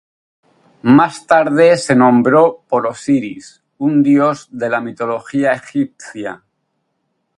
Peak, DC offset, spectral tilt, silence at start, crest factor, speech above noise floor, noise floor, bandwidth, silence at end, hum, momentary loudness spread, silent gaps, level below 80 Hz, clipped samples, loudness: 0 dBFS; under 0.1%; -6.5 dB/octave; 0.85 s; 14 dB; 55 dB; -69 dBFS; 11 kHz; 1.05 s; none; 14 LU; none; -60 dBFS; under 0.1%; -14 LUFS